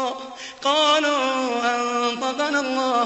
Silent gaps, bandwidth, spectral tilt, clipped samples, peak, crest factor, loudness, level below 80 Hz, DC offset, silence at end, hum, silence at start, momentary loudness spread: none; 8.4 kHz; -1 dB/octave; under 0.1%; -6 dBFS; 16 dB; -21 LUFS; -68 dBFS; under 0.1%; 0 s; none; 0 s; 10 LU